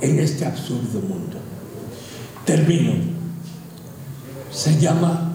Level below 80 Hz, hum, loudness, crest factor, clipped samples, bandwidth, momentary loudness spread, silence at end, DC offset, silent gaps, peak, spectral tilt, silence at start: -58 dBFS; none; -21 LUFS; 16 dB; under 0.1%; 16.5 kHz; 19 LU; 0 s; under 0.1%; none; -4 dBFS; -6 dB/octave; 0 s